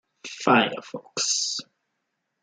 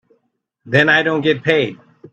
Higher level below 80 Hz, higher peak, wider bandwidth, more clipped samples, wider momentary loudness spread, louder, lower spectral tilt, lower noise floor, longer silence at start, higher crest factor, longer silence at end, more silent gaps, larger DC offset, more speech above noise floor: second, -76 dBFS vs -58 dBFS; second, -4 dBFS vs 0 dBFS; first, 10 kHz vs 8.4 kHz; neither; first, 15 LU vs 6 LU; second, -24 LUFS vs -15 LUFS; second, -2 dB/octave vs -6 dB/octave; first, -78 dBFS vs -68 dBFS; second, 0.25 s vs 0.65 s; about the same, 22 dB vs 18 dB; first, 0.8 s vs 0.4 s; neither; neither; about the same, 54 dB vs 53 dB